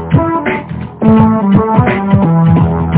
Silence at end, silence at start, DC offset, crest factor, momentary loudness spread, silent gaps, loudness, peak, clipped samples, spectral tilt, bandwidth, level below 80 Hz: 0 s; 0 s; under 0.1%; 10 dB; 8 LU; none; -10 LUFS; 0 dBFS; 2%; -12.5 dB/octave; 4 kHz; -26 dBFS